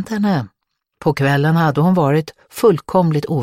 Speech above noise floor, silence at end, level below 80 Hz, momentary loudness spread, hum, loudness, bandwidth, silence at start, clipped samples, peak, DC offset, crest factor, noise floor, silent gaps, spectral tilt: 32 dB; 0 s; -52 dBFS; 8 LU; none; -16 LUFS; 15.5 kHz; 0 s; under 0.1%; -2 dBFS; under 0.1%; 14 dB; -47 dBFS; none; -7.5 dB/octave